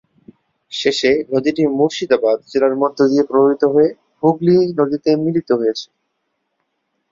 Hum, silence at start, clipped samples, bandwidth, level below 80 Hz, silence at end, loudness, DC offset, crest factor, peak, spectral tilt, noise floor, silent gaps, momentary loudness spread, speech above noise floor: none; 0.7 s; under 0.1%; 7.8 kHz; -58 dBFS; 1.25 s; -16 LUFS; under 0.1%; 14 dB; -2 dBFS; -6 dB/octave; -71 dBFS; none; 5 LU; 56 dB